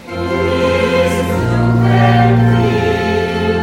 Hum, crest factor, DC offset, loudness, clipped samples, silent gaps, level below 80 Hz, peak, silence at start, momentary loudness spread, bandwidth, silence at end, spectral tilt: none; 12 dB; under 0.1%; -13 LUFS; under 0.1%; none; -34 dBFS; 0 dBFS; 0 s; 5 LU; 13.5 kHz; 0 s; -7 dB/octave